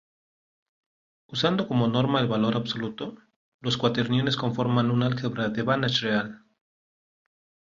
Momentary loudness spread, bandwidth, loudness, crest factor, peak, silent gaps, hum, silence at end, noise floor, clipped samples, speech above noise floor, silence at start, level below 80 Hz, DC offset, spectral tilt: 10 LU; 7.6 kHz; -25 LUFS; 18 dB; -8 dBFS; 3.36-3.59 s; none; 1.35 s; under -90 dBFS; under 0.1%; over 65 dB; 1.3 s; -62 dBFS; under 0.1%; -6.5 dB/octave